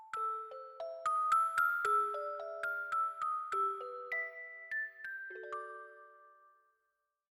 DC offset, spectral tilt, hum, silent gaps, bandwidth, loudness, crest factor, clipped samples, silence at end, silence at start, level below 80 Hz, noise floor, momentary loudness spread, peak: under 0.1%; -1.5 dB/octave; none; none; 17.5 kHz; -36 LUFS; 18 dB; under 0.1%; 1 s; 0 s; -86 dBFS; -84 dBFS; 15 LU; -20 dBFS